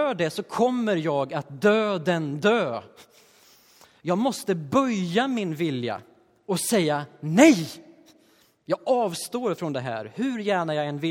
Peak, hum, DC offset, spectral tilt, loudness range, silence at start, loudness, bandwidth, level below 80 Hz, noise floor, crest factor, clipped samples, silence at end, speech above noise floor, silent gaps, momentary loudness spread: -2 dBFS; none; under 0.1%; -5 dB/octave; 4 LU; 0 s; -24 LUFS; 17 kHz; -70 dBFS; -61 dBFS; 24 dB; under 0.1%; 0 s; 37 dB; none; 9 LU